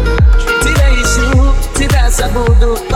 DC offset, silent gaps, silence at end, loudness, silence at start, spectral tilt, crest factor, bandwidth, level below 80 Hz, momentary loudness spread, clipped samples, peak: under 0.1%; none; 0 s; -12 LUFS; 0 s; -5 dB/octave; 8 dB; 15.5 kHz; -10 dBFS; 3 LU; under 0.1%; 0 dBFS